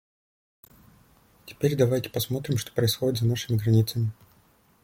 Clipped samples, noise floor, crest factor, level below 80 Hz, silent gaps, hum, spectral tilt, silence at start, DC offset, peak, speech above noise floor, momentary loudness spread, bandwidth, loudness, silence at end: under 0.1%; -61 dBFS; 18 dB; -58 dBFS; none; none; -6 dB/octave; 1.45 s; under 0.1%; -8 dBFS; 36 dB; 6 LU; 16.5 kHz; -26 LUFS; 0.7 s